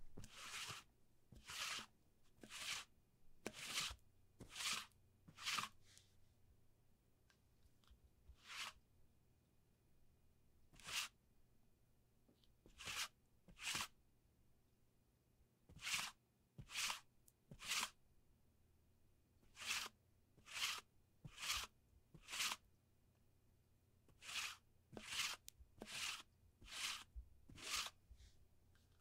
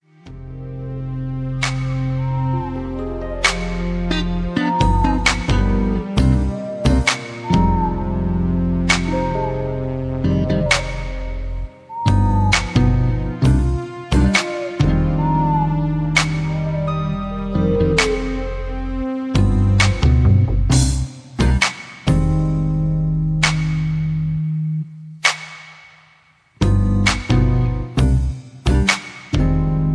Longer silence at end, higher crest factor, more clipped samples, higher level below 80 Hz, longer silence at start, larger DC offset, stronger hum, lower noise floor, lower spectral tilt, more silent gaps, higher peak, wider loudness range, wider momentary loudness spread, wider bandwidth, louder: about the same, 0 s vs 0 s; first, 26 dB vs 18 dB; neither; second, -72 dBFS vs -24 dBFS; second, 0 s vs 0.25 s; neither; neither; first, -78 dBFS vs -54 dBFS; second, 0 dB/octave vs -5.5 dB/octave; neither; second, -28 dBFS vs 0 dBFS; first, 7 LU vs 4 LU; first, 19 LU vs 10 LU; first, 16 kHz vs 11 kHz; second, -48 LUFS vs -19 LUFS